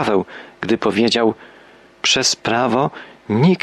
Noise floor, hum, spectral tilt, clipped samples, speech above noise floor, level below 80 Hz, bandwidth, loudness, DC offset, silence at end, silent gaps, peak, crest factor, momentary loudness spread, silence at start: -46 dBFS; none; -4 dB/octave; under 0.1%; 29 dB; -58 dBFS; 12.5 kHz; -17 LUFS; under 0.1%; 0.05 s; none; -4 dBFS; 14 dB; 14 LU; 0 s